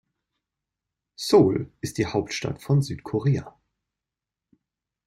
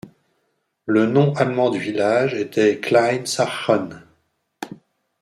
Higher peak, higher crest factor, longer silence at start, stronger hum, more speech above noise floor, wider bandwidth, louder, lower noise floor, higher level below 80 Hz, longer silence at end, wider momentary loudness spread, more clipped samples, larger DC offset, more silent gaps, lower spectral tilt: second, -6 dBFS vs -2 dBFS; about the same, 22 dB vs 18 dB; first, 1.2 s vs 0.05 s; neither; first, 65 dB vs 52 dB; first, 15.5 kHz vs 14 kHz; second, -24 LUFS vs -19 LUFS; first, -88 dBFS vs -70 dBFS; first, -56 dBFS vs -66 dBFS; first, 1.55 s vs 0.45 s; second, 11 LU vs 18 LU; neither; neither; neither; about the same, -6.5 dB/octave vs -5.5 dB/octave